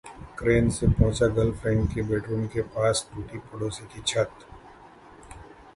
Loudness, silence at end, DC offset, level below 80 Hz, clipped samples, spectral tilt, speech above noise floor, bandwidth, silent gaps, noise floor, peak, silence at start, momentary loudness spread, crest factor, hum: -26 LUFS; 0.35 s; under 0.1%; -38 dBFS; under 0.1%; -5.5 dB/octave; 24 dB; 11.5 kHz; none; -49 dBFS; -6 dBFS; 0.05 s; 17 LU; 20 dB; none